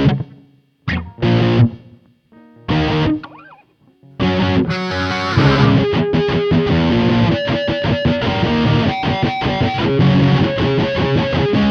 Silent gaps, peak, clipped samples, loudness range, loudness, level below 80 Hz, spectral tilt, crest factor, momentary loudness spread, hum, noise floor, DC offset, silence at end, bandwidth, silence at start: none; 0 dBFS; under 0.1%; 4 LU; -16 LUFS; -34 dBFS; -7.5 dB/octave; 16 dB; 8 LU; none; -51 dBFS; under 0.1%; 0 s; 6.8 kHz; 0 s